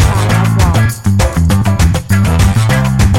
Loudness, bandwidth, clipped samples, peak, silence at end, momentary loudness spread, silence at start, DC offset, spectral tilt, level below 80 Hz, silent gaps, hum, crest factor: -11 LUFS; 16.5 kHz; under 0.1%; 0 dBFS; 0 s; 2 LU; 0 s; 1%; -6 dB/octave; -18 dBFS; none; none; 8 dB